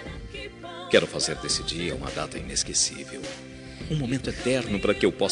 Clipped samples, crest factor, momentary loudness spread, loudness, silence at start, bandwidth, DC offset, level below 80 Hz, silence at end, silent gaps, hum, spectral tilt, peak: under 0.1%; 24 dB; 16 LU; -26 LUFS; 0 s; 11 kHz; under 0.1%; -44 dBFS; 0 s; none; none; -3 dB/octave; -2 dBFS